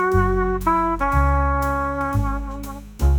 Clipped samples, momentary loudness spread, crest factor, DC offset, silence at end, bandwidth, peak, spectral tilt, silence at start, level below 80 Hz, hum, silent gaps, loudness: under 0.1%; 11 LU; 14 dB; under 0.1%; 0 s; 18.5 kHz; -6 dBFS; -8 dB/octave; 0 s; -24 dBFS; none; none; -21 LUFS